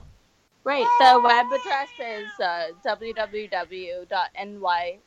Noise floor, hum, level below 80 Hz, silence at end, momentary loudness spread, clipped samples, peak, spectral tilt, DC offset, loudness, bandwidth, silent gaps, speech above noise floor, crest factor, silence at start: -62 dBFS; none; -62 dBFS; 0.15 s; 17 LU; under 0.1%; -4 dBFS; -2.5 dB/octave; under 0.1%; -23 LUFS; 10.5 kHz; none; 39 dB; 18 dB; 0.65 s